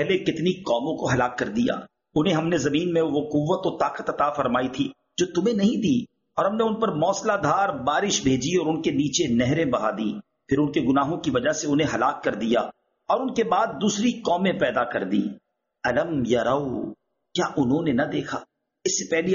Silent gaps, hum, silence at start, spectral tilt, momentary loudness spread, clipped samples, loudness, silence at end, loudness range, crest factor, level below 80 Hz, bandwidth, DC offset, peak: none; none; 0 s; -4.5 dB/octave; 7 LU; under 0.1%; -24 LUFS; 0 s; 2 LU; 16 dB; -56 dBFS; 7.2 kHz; under 0.1%; -8 dBFS